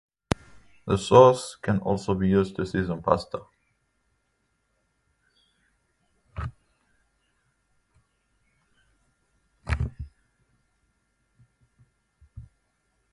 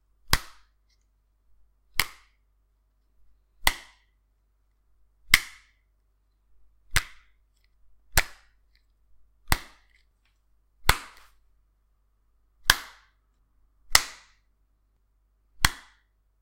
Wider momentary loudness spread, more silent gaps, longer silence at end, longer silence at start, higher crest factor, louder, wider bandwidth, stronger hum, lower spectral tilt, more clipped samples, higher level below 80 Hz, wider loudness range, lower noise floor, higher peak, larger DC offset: first, 24 LU vs 21 LU; neither; about the same, 0.7 s vs 0.65 s; first, 0.85 s vs 0.3 s; second, 26 dB vs 32 dB; about the same, -24 LUFS vs -26 LUFS; second, 11.5 kHz vs 16 kHz; neither; first, -6.5 dB/octave vs -1 dB/octave; neither; about the same, -44 dBFS vs -40 dBFS; first, 23 LU vs 5 LU; first, -73 dBFS vs -68 dBFS; about the same, -2 dBFS vs 0 dBFS; neither